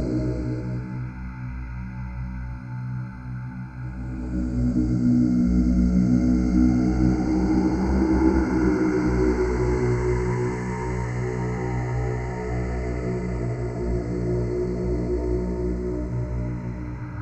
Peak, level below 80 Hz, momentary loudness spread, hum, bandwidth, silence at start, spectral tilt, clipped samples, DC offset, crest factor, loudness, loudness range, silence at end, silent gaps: -6 dBFS; -30 dBFS; 14 LU; none; 8.4 kHz; 0 s; -8.5 dB/octave; under 0.1%; under 0.1%; 16 dB; -25 LUFS; 11 LU; 0 s; none